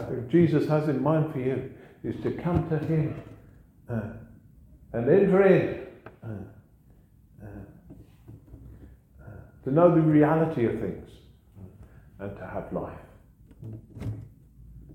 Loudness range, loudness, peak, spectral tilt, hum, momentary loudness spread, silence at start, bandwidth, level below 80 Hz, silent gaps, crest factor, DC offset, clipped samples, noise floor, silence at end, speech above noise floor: 14 LU; -25 LUFS; -8 dBFS; -10 dB/octave; none; 24 LU; 0 s; 8.4 kHz; -52 dBFS; none; 20 dB; under 0.1%; under 0.1%; -57 dBFS; 0 s; 32 dB